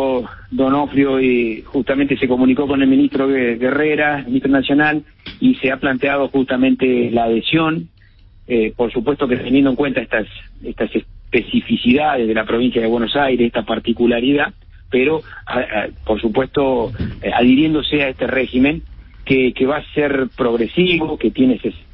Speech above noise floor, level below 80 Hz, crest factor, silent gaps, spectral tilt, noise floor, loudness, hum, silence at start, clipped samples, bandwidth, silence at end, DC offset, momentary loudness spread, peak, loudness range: 29 dB; -40 dBFS; 14 dB; none; -11 dB/octave; -45 dBFS; -17 LUFS; none; 0 s; under 0.1%; 5.2 kHz; 0.15 s; under 0.1%; 7 LU; -2 dBFS; 3 LU